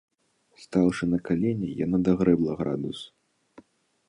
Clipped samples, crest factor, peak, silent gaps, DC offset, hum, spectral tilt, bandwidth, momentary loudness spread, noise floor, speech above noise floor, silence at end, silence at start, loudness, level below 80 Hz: under 0.1%; 20 dB; -8 dBFS; none; under 0.1%; none; -8 dB/octave; 10.5 kHz; 11 LU; -63 dBFS; 38 dB; 1.05 s; 0.6 s; -26 LUFS; -54 dBFS